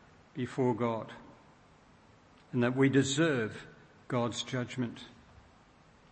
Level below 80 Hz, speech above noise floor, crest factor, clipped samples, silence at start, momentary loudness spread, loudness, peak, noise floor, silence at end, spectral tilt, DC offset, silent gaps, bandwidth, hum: -68 dBFS; 30 dB; 20 dB; under 0.1%; 0.35 s; 22 LU; -32 LUFS; -14 dBFS; -61 dBFS; 1 s; -5.5 dB/octave; under 0.1%; none; 8.8 kHz; none